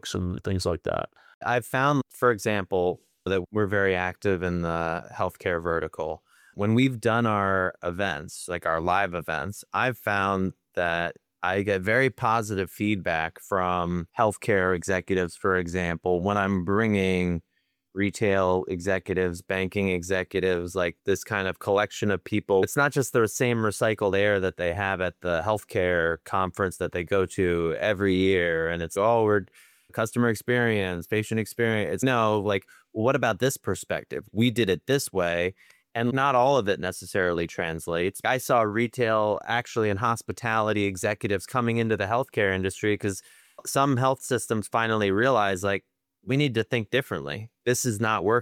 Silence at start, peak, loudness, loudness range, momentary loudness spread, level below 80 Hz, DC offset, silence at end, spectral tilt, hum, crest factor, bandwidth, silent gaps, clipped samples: 0.05 s; -8 dBFS; -26 LUFS; 2 LU; 7 LU; -54 dBFS; under 0.1%; 0 s; -5.5 dB/octave; none; 18 dB; 17 kHz; 1.34-1.41 s; under 0.1%